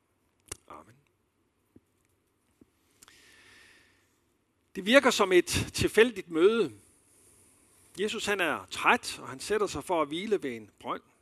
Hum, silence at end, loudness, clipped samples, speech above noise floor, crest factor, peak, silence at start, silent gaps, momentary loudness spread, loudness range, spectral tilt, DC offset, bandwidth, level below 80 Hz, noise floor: none; 0.25 s; -27 LUFS; under 0.1%; 46 dB; 26 dB; -6 dBFS; 0.7 s; none; 18 LU; 5 LU; -3.5 dB/octave; under 0.1%; 14 kHz; -58 dBFS; -74 dBFS